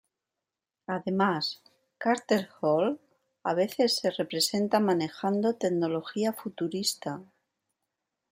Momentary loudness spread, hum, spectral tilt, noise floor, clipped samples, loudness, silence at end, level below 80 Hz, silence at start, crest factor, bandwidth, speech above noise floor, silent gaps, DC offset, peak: 10 LU; none; -4.5 dB/octave; -89 dBFS; under 0.1%; -28 LUFS; 1.05 s; -76 dBFS; 0.9 s; 20 dB; 16.5 kHz; 61 dB; none; under 0.1%; -10 dBFS